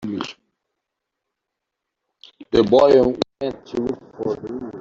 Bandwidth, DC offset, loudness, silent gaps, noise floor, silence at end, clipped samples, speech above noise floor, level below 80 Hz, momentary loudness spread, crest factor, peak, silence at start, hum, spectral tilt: 7.6 kHz; under 0.1%; -19 LUFS; none; -82 dBFS; 0 s; under 0.1%; 63 dB; -50 dBFS; 16 LU; 20 dB; -2 dBFS; 0 s; none; -6.5 dB/octave